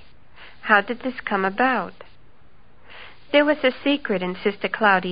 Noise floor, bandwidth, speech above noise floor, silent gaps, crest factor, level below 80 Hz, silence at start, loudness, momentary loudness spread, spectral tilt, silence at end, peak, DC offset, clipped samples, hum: -55 dBFS; 5.2 kHz; 34 dB; none; 22 dB; -58 dBFS; 0.4 s; -21 LUFS; 16 LU; -9.5 dB/octave; 0 s; 0 dBFS; 0.8%; under 0.1%; none